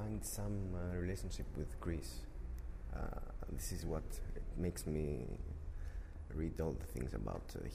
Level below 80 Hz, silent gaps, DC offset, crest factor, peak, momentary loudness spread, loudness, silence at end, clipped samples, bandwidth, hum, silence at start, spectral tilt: -46 dBFS; none; under 0.1%; 16 dB; -28 dBFS; 8 LU; -45 LUFS; 0 s; under 0.1%; 15.5 kHz; none; 0 s; -6 dB/octave